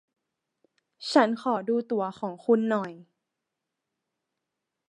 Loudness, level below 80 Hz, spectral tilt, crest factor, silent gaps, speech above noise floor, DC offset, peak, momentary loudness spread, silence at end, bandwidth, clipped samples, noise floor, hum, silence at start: -26 LUFS; -82 dBFS; -5.5 dB/octave; 24 dB; none; 59 dB; under 0.1%; -6 dBFS; 10 LU; 1.85 s; 10 kHz; under 0.1%; -85 dBFS; none; 1 s